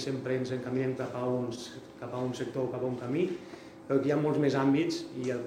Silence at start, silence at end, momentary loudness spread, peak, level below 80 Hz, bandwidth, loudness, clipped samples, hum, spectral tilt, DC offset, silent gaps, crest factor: 0 s; 0 s; 14 LU; -14 dBFS; -70 dBFS; 13 kHz; -31 LUFS; under 0.1%; none; -6.5 dB/octave; under 0.1%; none; 16 dB